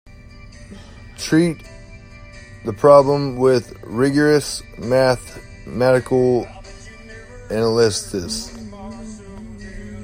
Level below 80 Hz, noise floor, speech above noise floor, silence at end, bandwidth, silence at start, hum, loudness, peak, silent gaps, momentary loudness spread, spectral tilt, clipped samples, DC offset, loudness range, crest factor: -42 dBFS; -40 dBFS; 23 dB; 0 s; 16 kHz; 0.2 s; none; -17 LUFS; 0 dBFS; none; 24 LU; -5.5 dB/octave; under 0.1%; under 0.1%; 6 LU; 20 dB